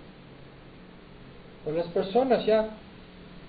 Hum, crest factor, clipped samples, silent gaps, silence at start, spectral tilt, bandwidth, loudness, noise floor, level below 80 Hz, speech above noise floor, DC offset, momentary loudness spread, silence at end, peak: none; 18 dB; under 0.1%; none; 0 s; -10 dB/octave; 5 kHz; -27 LUFS; -48 dBFS; -56 dBFS; 23 dB; under 0.1%; 26 LU; 0 s; -12 dBFS